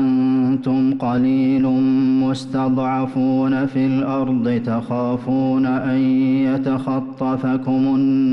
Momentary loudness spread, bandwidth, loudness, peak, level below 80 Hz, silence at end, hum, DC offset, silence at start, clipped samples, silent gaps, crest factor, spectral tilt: 5 LU; 6 kHz; -18 LUFS; -10 dBFS; -54 dBFS; 0 s; none; under 0.1%; 0 s; under 0.1%; none; 6 dB; -8.5 dB/octave